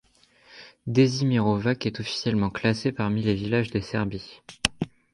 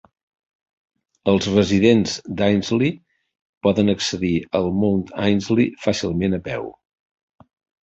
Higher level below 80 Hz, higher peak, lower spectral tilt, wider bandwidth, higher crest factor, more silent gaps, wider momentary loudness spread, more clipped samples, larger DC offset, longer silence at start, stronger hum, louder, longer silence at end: about the same, -50 dBFS vs -46 dBFS; about the same, 0 dBFS vs -2 dBFS; about the same, -6 dB/octave vs -6 dB/octave; first, 11.5 kHz vs 8.2 kHz; first, 26 dB vs 20 dB; second, none vs 3.41-3.61 s; about the same, 10 LU vs 9 LU; neither; neither; second, 0.55 s vs 1.25 s; neither; second, -25 LUFS vs -20 LUFS; second, 0.25 s vs 1.1 s